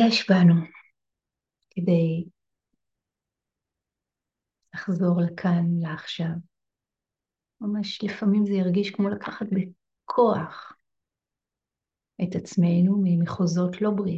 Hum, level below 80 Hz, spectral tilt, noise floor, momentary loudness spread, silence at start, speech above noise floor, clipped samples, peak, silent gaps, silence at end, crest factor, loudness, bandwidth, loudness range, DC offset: none; -66 dBFS; -7.5 dB/octave; -89 dBFS; 15 LU; 0 s; 66 dB; under 0.1%; -8 dBFS; none; 0 s; 18 dB; -24 LUFS; 7.6 kHz; 5 LU; under 0.1%